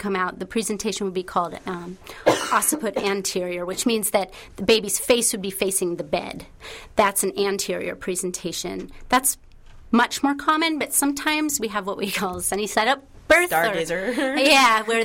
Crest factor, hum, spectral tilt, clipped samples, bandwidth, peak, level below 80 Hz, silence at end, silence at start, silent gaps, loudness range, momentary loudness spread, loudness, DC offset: 18 dB; none; -2.5 dB/octave; under 0.1%; 16.5 kHz; -4 dBFS; -50 dBFS; 0 s; 0 s; none; 3 LU; 10 LU; -22 LUFS; under 0.1%